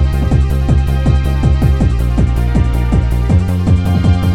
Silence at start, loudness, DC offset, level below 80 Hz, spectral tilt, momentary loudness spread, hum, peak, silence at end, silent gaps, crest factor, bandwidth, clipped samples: 0 s; -13 LUFS; under 0.1%; -14 dBFS; -8 dB/octave; 2 LU; none; -2 dBFS; 0 s; none; 10 dB; 13 kHz; under 0.1%